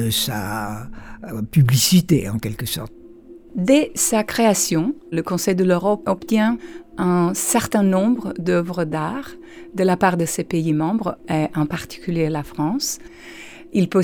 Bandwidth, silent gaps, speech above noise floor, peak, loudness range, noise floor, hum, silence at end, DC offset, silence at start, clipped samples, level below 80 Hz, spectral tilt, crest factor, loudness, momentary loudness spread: over 20 kHz; none; 23 dB; -4 dBFS; 3 LU; -42 dBFS; none; 0 s; under 0.1%; 0 s; under 0.1%; -48 dBFS; -5 dB/octave; 16 dB; -20 LUFS; 16 LU